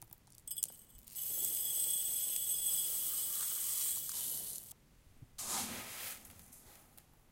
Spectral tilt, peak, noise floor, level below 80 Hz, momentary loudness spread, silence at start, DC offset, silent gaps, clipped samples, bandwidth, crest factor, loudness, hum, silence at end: 0.5 dB/octave; -12 dBFS; -63 dBFS; -70 dBFS; 20 LU; 0 s; under 0.1%; none; under 0.1%; 17 kHz; 28 dB; -35 LUFS; none; 0.3 s